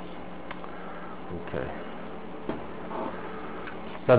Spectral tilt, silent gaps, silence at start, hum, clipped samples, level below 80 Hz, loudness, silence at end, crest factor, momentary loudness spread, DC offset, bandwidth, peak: -6 dB/octave; none; 0 s; none; under 0.1%; -54 dBFS; -37 LUFS; 0 s; 26 dB; 6 LU; 1%; 4 kHz; -6 dBFS